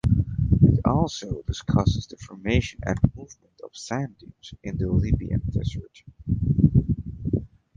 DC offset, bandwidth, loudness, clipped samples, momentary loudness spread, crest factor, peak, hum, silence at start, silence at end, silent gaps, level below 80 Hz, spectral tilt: under 0.1%; 7.6 kHz; -24 LUFS; under 0.1%; 20 LU; 20 dB; -4 dBFS; none; 0.05 s; 0.3 s; none; -34 dBFS; -7.5 dB/octave